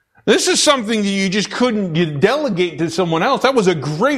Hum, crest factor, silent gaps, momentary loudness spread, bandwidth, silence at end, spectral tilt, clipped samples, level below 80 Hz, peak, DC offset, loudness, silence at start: none; 16 dB; none; 6 LU; 14.5 kHz; 0 s; -4 dB/octave; under 0.1%; -54 dBFS; -2 dBFS; under 0.1%; -16 LUFS; 0.25 s